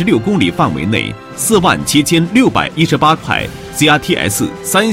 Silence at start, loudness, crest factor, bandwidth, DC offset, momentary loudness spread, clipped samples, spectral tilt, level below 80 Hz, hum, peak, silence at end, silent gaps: 0 s; -13 LUFS; 12 dB; 16.5 kHz; under 0.1%; 6 LU; 0.4%; -4 dB/octave; -40 dBFS; none; 0 dBFS; 0 s; none